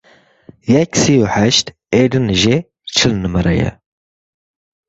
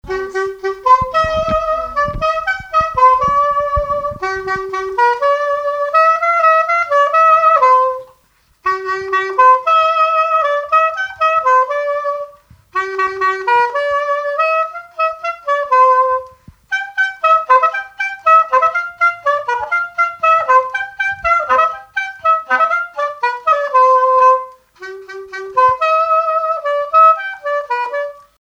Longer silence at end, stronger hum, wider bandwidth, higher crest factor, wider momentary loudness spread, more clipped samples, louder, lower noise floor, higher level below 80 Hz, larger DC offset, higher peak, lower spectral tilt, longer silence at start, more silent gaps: first, 1.15 s vs 0.45 s; neither; second, 8 kHz vs 9.2 kHz; about the same, 16 dB vs 14 dB; second, 6 LU vs 11 LU; neither; about the same, -14 LUFS vs -14 LUFS; second, -45 dBFS vs -55 dBFS; first, -36 dBFS vs -42 dBFS; neither; about the same, 0 dBFS vs 0 dBFS; about the same, -4.5 dB/octave vs -4 dB/octave; first, 0.65 s vs 0.05 s; neither